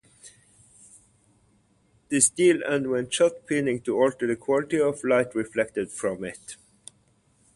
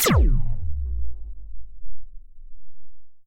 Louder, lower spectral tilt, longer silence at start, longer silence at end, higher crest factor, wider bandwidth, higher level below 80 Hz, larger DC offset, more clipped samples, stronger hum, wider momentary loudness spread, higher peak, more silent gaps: about the same, -24 LUFS vs -26 LUFS; about the same, -3.5 dB/octave vs -4.5 dB/octave; first, 0.25 s vs 0 s; first, 1 s vs 0 s; first, 22 dB vs 14 dB; second, 11.5 kHz vs 16.5 kHz; second, -64 dBFS vs -26 dBFS; neither; neither; neither; second, 11 LU vs 26 LU; about the same, -6 dBFS vs -8 dBFS; neither